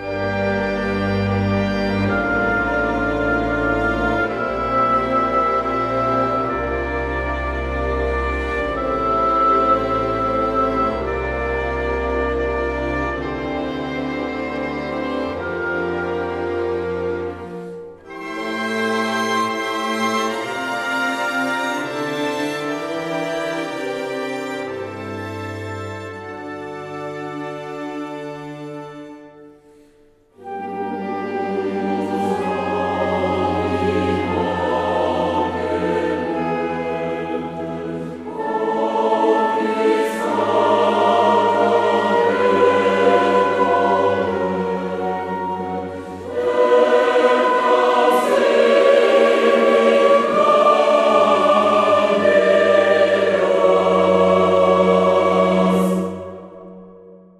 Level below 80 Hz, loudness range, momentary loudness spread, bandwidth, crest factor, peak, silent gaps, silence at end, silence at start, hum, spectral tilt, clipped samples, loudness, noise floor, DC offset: -38 dBFS; 12 LU; 14 LU; 14 kHz; 16 dB; -2 dBFS; none; 0.25 s; 0 s; none; -6 dB/octave; under 0.1%; -18 LUFS; -53 dBFS; under 0.1%